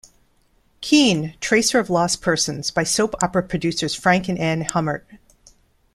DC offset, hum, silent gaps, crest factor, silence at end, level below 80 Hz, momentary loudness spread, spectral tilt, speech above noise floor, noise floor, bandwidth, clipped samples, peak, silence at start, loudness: under 0.1%; none; none; 20 dB; 0.8 s; -50 dBFS; 7 LU; -3.5 dB/octave; 41 dB; -60 dBFS; 14.5 kHz; under 0.1%; -2 dBFS; 0.8 s; -19 LUFS